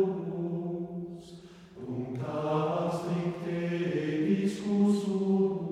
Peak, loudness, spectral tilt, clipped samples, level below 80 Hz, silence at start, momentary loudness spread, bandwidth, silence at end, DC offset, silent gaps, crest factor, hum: -16 dBFS; -31 LUFS; -8 dB/octave; under 0.1%; -66 dBFS; 0 s; 15 LU; 11 kHz; 0 s; under 0.1%; none; 14 dB; none